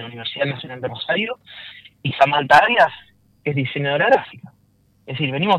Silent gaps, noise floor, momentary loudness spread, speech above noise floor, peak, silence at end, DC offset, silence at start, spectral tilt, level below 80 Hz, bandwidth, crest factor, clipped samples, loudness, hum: none; -59 dBFS; 20 LU; 40 dB; -2 dBFS; 0 s; under 0.1%; 0 s; -6 dB/octave; -60 dBFS; 12.5 kHz; 18 dB; under 0.1%; -19 LUFS; none